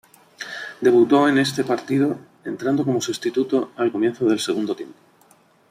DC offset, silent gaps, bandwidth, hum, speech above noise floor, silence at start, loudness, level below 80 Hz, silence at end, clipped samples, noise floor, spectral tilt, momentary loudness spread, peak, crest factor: under 0.1%; none; 15 kHz; none; 36 dB; 0.4 s; -20 LUFS; -66 dBFS; 0.8 s; under 0.1%; -56 dBFS; -5 dB/octave; 16 LU; -6 dBFS; 16 dB